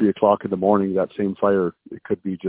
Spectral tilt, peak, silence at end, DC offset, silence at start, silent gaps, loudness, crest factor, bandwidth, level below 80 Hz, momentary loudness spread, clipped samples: -11.5 dB/octave; -2 dBFS; 0 s; under 0.1%; 0 s; none; -21 LUFS; 18 dB; 4 kHz; -56 dBFS; 9 LU; under 0.1%